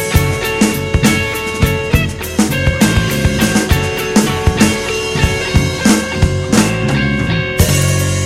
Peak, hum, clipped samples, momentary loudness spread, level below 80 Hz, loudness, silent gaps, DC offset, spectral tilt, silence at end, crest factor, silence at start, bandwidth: 0 dBFS; none; under 0.1%; 3 LU; -24 dBFS; -14 LUFS; none; under 0.1%; -4.5 dB/octave; 0 s; 14 dB; 0 s; 16.5 kHz